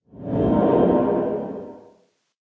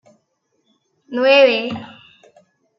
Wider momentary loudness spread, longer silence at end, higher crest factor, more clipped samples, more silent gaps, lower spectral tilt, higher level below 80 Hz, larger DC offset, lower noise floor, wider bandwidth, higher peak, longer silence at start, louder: about the same, 17 LU vs 17 LU; second, 0.6 s vs 0.9 s; about the same, 16 dB vs 18 dB; neither; neither; first, -11 dB/octave vs -5 dB/octave; first, -44 dBFS vs -74 dBFS; neither; second, -60 dBFS vs -68 dBFS; second, 4.3 kHz vs 6 kHz; second, -6 dBFS vs -2 dBFS; second, 0.15 s vs 1.1 s; second, -20 LUFS vs -15 LUFS